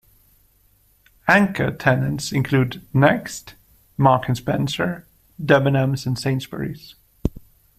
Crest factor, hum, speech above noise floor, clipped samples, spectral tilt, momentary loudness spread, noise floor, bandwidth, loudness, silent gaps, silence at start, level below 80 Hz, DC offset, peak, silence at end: 20 dB; none; 39 dB; under 0.1%; -6 dB/octave; 14 LU; -58 dBFS; 15 kHz; -20 LUFS; none; 1.25 s; -44 dBFS; under 0.1%; 0 dBFS; 0.4 s